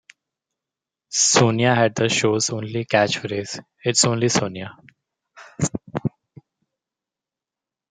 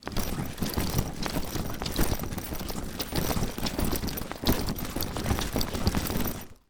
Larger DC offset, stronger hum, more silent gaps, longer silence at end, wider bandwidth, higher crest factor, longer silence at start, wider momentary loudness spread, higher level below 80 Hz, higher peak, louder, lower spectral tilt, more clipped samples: neither; neither; neither; first, 1.8 s vs 0.15 s; second, 10 kHz vs over 20 kHz; about the same, 20 dB vs 20 dB; first, 1.1 s vs 0 s; first, 13 LU vs 5 LU; second, -60 dBFS vs -36 dBFS; first, -2 dBFS vs -8 dBFS; first, -20 LUFS vs -31 LUFS; about the same, -3.5 dB/octave vs -4.5 dB/octave; neither